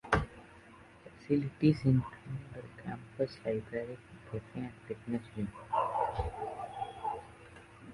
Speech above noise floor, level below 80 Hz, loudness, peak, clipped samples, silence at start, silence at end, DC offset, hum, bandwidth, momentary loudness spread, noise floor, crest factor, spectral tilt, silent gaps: 22 dB; -52 dBFS; -36 LUFS; -12 dBFS; under 0.1%; 0.05 s; 0 s; under 0.1%; none; 11.5 kHz; 24 LU; -56 dBFS; 24 dB; -8 dB/octave; none